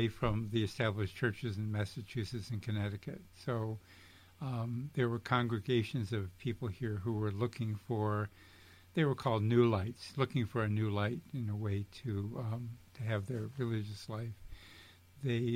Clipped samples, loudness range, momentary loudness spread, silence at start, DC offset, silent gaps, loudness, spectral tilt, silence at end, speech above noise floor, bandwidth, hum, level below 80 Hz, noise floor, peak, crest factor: under 0.1%; 6 LU; 10 LU; 0 s; under 0.1%; none; -37 LUFS; -7.5 dB/octave; 0 s; 23 dB; 15 kHz; none; -60 dBFS; -58 dBFS; -16 dBFS; 20 dB